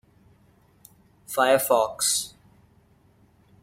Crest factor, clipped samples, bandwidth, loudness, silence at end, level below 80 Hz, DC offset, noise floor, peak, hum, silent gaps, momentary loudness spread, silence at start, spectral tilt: 22 dB; under 0.1%; 16 kHz; -22 LUFS; 1.35 s; -66 dBFS; under 0.1%; -59 dBFS; -6 dBFS; none; none; 10 LU; 1.3 s; -1.5 dB/octave